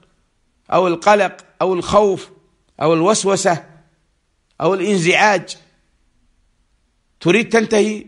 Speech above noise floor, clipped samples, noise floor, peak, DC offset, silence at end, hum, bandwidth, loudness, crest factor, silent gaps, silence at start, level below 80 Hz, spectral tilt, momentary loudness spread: 48 dB; under 0.1%; -64 dBFS; 0 dBFS; under 0.1%; 0.05 s; none; 11.5 kHz; -16 LUFS; 18 dB; none; 0.7 s; -52 dBFS; -4.5 dB/octave; 8 LU